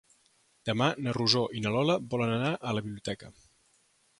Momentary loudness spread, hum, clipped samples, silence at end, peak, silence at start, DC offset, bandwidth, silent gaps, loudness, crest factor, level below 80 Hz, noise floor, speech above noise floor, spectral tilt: 12 LU; none; under 0.1%; 0.9 s; -8 dBFS; 0.65 s; under 0.1%; 11.5 kHz; none; -29 LUFS; 22 dB; -64 dBFS; -68 dBFS; 39 dB; -5.5 dB/octave